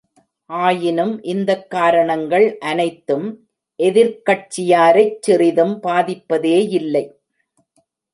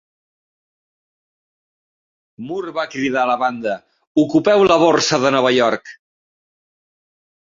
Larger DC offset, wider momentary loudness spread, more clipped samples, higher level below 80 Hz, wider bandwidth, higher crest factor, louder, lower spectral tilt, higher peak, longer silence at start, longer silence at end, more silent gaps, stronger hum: neither; second, 8 LU vs 14 LU; neither; second, -68 dBFS vs -58 dBFS; first, 11.5 kHz vs 7.6 kHz; about the same, 16 dB vs 18 dB; about the same, -16 LUFS vs -16 LUFS; about the same, -5.5 dB/octave vs -4.5 dB/octave; about the same, -2 dBFS vs 0 dBFS; second, 0.5 s vs 2.4 s; second, 1.05 s vs 1.6 s; second, none vs 4.07-4.15 s; neither